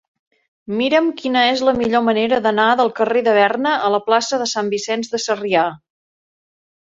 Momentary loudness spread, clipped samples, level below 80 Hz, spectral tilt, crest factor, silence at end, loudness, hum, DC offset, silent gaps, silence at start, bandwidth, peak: 6 LU; under 0.1%; -58 dBFS; -3.5 dB/octave; 16 dB; 1.05 s; -17 LUFS; none; under 0.1%; none; 0.7 s; 7.8 kHz; -2 dBFS